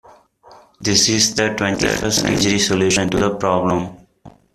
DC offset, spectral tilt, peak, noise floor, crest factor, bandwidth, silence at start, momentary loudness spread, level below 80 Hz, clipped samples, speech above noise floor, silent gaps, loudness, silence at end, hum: under 0.1%; -3 dB/octave; 0 dBFS; -47 dBFS; 18 dB; 15 kHz; 0.5 s; 6 LU; -44 dBFS; under 0.1%; 30 dB; none; -16 LUFS; 0.25 s; none